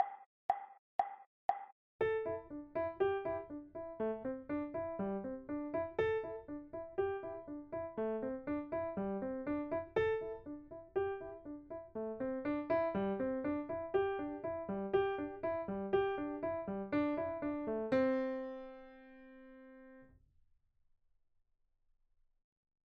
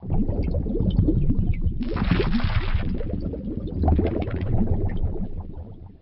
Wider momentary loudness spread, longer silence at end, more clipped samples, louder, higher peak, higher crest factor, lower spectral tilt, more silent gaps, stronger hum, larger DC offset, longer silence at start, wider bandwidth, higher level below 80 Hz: first, 13 LU vs 10 LU; first, 2.8 s vs 0.1 s; neither; second, -39 LUFS vs -25 LUFS; second, -20 dBFS vs -8 dBFS; first, 20 dB vs 14 dB; second, -5.5 dB/octave vs -7.5 dB/octave; first, 0.26-0.49 s, 0.79-0.99 s, 1.27-1.49 s, 1.72-1.99 s vs none; neither; neither; about the same, 0 s vs 0 s; about the same, 6 kHz vs 5.6 kHz; second, -66 dBFS vs -26 dBFS